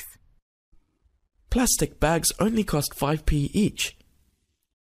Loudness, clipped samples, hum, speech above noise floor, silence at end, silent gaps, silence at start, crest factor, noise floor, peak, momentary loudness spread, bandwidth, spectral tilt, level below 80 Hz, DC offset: -24 LUFS; under 0.1%; none; 47 dB; 1.05 s; 0.42-0.72 s; 0 s; 20 dB; -70 dBFS; -6 dBFS; 7 LU; 15.5 kHz; -4 dB/octave; -36 dBFS; under 0.1%